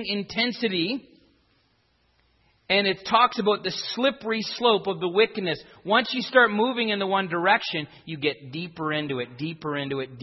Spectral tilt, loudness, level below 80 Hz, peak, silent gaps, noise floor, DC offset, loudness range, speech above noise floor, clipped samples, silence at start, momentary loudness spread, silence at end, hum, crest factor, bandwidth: -5 dB/octave; -24 LUFS; -68 dBFS; -4 dBFS; none; -67 dBFS; under 0.1%; 3 LU; 42 dB; under 0.1%; 0 s; 10 LU; 0 s; none; 20 dB; 6 kHz